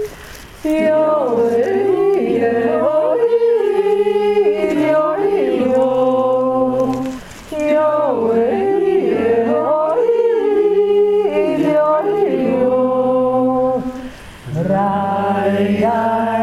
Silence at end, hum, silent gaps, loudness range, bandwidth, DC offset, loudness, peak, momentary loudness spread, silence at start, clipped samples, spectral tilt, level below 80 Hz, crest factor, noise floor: 0 s; none; none; 2 LU; 13.5 kHz; under 0.1%; -15 LUFS; -4 dBFS; 6 LU; 0 s; under 0.1%; -7 dB/octave; -48 dBFS; 10 dB; -35 dBFS